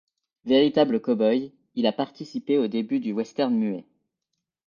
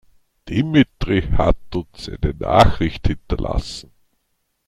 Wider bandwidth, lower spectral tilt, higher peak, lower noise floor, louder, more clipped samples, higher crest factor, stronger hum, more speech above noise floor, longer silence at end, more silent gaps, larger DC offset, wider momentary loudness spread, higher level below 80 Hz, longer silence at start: second, 7.2 kHz vs 12.5 kHz; about the same, -7 dB/octave vs -7 dB/octave; second, -6 dBFS vs 0 dBFS; first, -83 dBFS vs -70 dBFS; second, -24 LUFS vs -20 LUFS; neither; about the same, 18 dB vs 20 dB; neither; first, 59 dB vs 52 dB; about the same, 0.85 s vs 0.85 s; neither; neither; about the same, 12 LU vs 14 LU; second, -70 dBFS vs -28 dBFS; about the same, 0.45 s vs 0.45 s